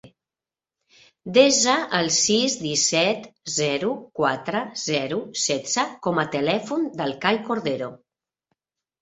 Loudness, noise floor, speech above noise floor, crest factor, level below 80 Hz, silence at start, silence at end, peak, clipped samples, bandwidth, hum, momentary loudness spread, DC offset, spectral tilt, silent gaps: -22 LUFS; under -90 dBFS; over 67 dB; 22 dB; -66 dBFS; 0.05 s; 1.05 s; -2 dBFS; under 0.1%; 8.4 kHz; none; 10 LU; under 0.1%; -2.5 dB/octave; none